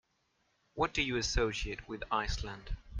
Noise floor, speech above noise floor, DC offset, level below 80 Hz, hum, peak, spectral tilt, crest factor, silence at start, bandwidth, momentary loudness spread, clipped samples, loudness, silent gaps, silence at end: -77 dBFS; 42 dB; under 0.1%; -44 dBFS; none; -16 dBFS; -3.5 dB/octave; 20 dB; 0.75 s; 9.8 kHz; 13 LU; under 0.1%; -35 LUFS; none; 0 s